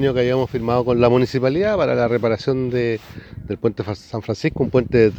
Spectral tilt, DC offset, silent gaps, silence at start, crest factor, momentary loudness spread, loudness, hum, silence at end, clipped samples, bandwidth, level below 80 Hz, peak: -7.5 dB/octave; under 0.1%; none; 0 s; 18 dB; 12 LU; -19 LUFS; none; 0 s; under 0.1%; 8.2 kHz; -44 dBFS; -2 dBFS